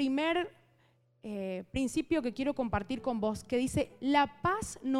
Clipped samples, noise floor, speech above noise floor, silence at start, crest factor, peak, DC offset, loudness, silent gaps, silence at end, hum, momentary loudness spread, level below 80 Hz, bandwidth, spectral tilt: under 0.1%; -69 dBFS; 37 dB; 0 s; 18 dB; -14 dBFS; under 0.1%; -33 LUFS; none; 0 s; none; 10 LU; -54 dBFS; 14 kHz; -5 dB/octave